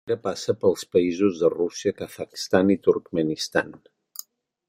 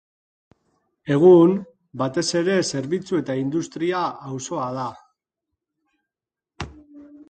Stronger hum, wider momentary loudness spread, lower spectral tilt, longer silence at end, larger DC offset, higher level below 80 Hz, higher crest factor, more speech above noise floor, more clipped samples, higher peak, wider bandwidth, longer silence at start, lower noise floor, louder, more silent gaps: neither; second, 16 LU vs 23 LU; about the same, -5 dB/octave vs -5.5 dB/octave; first, 0.95 s vs 0.05 s; neither; second, -64 dBFS vs -56 dBFS; about the same, 22 dB vs 20 dB; second, 21 dB vs 69 dB; neither; about the same, -2 dBFS vs -4 dBFS; first, 16.5 kHz vs 9.2 kHz; second, 0.05 s vs 1.05 s; second, -44 dBFS vs -89 dBFS; second, -24 LUFS vs -21 LUFS; neither